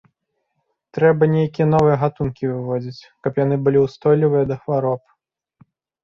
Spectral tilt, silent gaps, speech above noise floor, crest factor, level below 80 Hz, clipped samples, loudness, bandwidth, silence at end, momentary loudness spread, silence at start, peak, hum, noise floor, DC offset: -9.5 dB/octave; none; 55 dB; 16 dB; -52 dBFS; under 0.1%; -19 LUFS; 7 kHz; 1.05 s; 11 LU; 0.95 s; -2 dBFS; none; -73 dBFS; under 0.1%